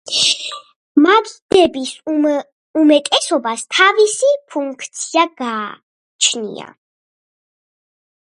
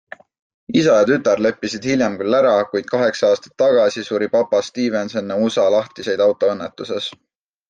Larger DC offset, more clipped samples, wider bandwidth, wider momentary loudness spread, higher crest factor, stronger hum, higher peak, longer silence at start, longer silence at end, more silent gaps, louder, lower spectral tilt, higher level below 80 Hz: neither; neither; first, 11.5 kHz vs 9 kHz; first, 13 LU vs 9 LU; about the same, 16 dB vs 14 dB; neither; first, 0 dBFS vs -4 dBFS; second, 0.05 s vs 0.7 s; first, 1.6 s vs 0.6 s; first, 0.76-0.95 s, 1.42-1.49 s, 2.52-2.74 s, 5.83-6.19 s vs none; first, -15 LUFS vs -18 LUFS; second, -1.5 dB/octave vs -5 dB/octave; about the same, -60 dBFS vs -62 dBFS